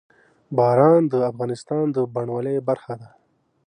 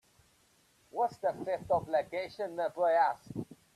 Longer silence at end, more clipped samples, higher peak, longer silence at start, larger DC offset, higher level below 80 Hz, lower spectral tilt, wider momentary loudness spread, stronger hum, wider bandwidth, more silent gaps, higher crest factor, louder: first, 0.6 s vs 0.2 s; neither; first, -4 dBFS vs -18 dBFS; second, 0.5 s vs 0.95 s; neither; about the same, -68 dBFS vs -68 dBFS; first, -8.5 dB/octave vs -6 dB/octave; about the same, 13 LU vs 14 LU; neither; second, 10 kHz vs 13.5 kHz; neither; about the same, 18 dB vs 16 dB; first, -21 LUFS vs -33 LUFS